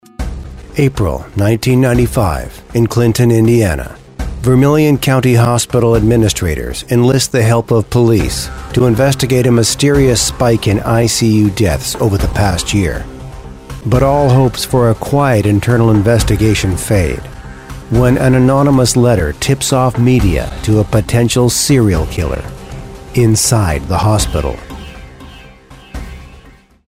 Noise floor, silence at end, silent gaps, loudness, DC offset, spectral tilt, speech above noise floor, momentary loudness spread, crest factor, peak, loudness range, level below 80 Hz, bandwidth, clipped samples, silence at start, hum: -41 dBFS; 0.4 s; none; -12 LUFS; 0.4%; -5.5 dB/octave; 30 dB; 15 LU; 12 dB; 0 dBFS; 3 LU; -26 dBFS; 16 kHz; under 0.1%; 0.2 s; none